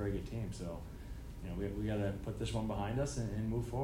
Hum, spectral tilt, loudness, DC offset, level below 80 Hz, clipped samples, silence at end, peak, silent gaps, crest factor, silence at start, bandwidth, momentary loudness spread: none; -6.5 dB/octave; -40 LUFS; under 0.1%; -48 dBFS; under 0.1%; 0 s; -24 dBFS; none; 14 dB; 0 s; 16 kHz; 11 LU